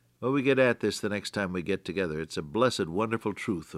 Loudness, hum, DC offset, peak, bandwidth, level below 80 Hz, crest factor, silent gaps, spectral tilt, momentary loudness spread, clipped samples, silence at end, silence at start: -29 LUFS; none; under 0.1%; -10 dBFS; 15 kHz; -62 dBFS; 18 dB; none; -5.5 dB/octave; 8 LU; under 0.1%; 0 s; 0.2 s